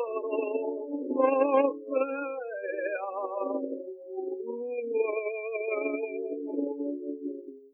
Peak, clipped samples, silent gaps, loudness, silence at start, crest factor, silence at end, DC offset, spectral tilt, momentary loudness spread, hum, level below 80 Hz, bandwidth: -12 dBFS; under 0.1%; none; -31 LUFS; 0 s; 20 dB; 0.05 s; under 0.1%; -8 dB/octave; 11 LU; none; under -90 dBFS; 3.4 kHz